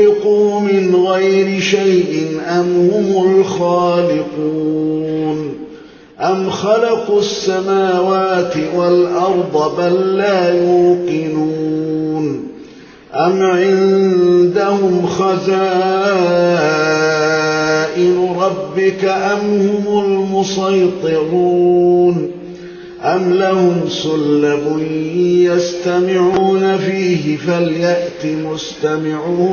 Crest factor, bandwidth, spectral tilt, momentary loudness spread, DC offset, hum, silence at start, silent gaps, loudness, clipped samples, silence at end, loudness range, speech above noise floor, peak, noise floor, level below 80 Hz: 12 dB; 7 kHz; -6 dB/octave; 7 LU; under 0.1%; none; 0 s; none; -14 LUFS; under 0.1%; 0 s; 3 LU; 24 dB; -2 dBFS; -38 dBFS; -54 dBFS